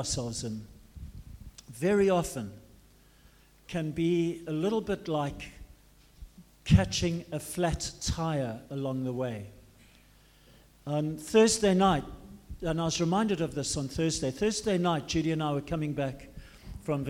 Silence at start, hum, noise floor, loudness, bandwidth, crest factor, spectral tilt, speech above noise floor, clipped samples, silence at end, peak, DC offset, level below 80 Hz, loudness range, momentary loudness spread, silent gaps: 0 s; none; -59 dBFS; -30 LUFS; 16 kHz; 22 dB; -5 dB/octave; 30 dB; under 0.1%; 0 s; -8 dBFS; under 0.1%; -48 dBFS; 6 LU; 23 LU; none